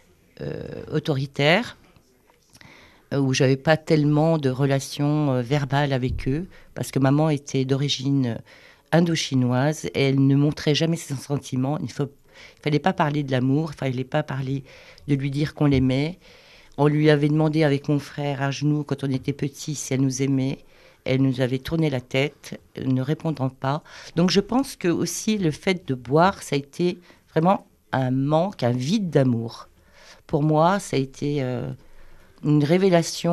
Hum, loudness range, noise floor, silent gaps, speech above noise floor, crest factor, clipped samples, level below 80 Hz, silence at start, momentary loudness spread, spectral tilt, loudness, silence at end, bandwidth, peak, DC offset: none; 3 LU; -59 dBFS; none; 37 dB; 18 dB; under 0.1%; -50 dBFS; 0.4 s; 10 LU; -6 dB/octave; -23 LUFS; 0 s; 13 kHz; -4 dBFS; under 0.1%